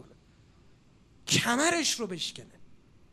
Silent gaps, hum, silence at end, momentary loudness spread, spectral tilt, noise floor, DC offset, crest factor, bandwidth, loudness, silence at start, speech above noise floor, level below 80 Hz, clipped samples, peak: none; none; 0.35 s; 16 LU; -2.5 dB/octave; -59 dBFS; under 0.1%; 22 dB; 15.5 kHz; -27 LUFS; 1.25 s; 30 dB; -64 dBFS; under 0.1%; -12 dBFS